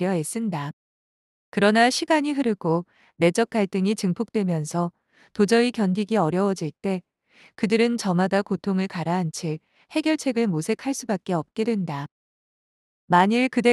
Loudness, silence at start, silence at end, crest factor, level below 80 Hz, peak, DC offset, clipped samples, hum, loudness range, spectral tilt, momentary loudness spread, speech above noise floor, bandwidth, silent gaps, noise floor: -23 LUFS; 0 s; 0 s; 20 dB; -68 dBFS; -4 dBFS; under 0.1%; under 0.1%; none; 3 LU; -5.5 dB/octave; 11 LU; over 67 dB; 12.5 kHz; 0.73-1.52 s, 12.11-13.08 s; under -90 dBFS